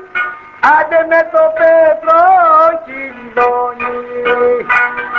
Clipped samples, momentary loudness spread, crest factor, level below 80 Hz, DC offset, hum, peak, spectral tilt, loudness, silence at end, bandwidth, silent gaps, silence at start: under 0.1%; 12 LU; 12 dB; -50 dBFS; under 0.1%; none; 0 dBFS; -5 dB/octave; -11 LUFS; 0 s; 6.8 kHz; none; 0 s